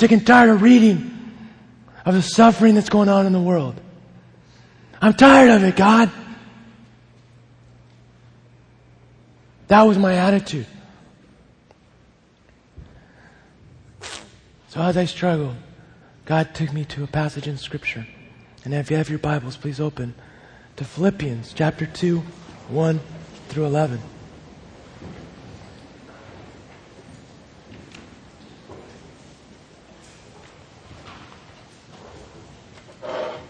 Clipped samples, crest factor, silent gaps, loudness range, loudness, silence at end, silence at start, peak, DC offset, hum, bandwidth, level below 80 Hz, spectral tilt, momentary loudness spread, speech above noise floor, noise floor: under 0.1%; 20 dB; none; 13 LU; -17 LUFS; 0.05 s; 0 s; 0 dBFS; under 0.1%; none; 10 kHz; -52 dBFS; -6.5 dB/octave; 26 LU; 38 dB; -55 dBFS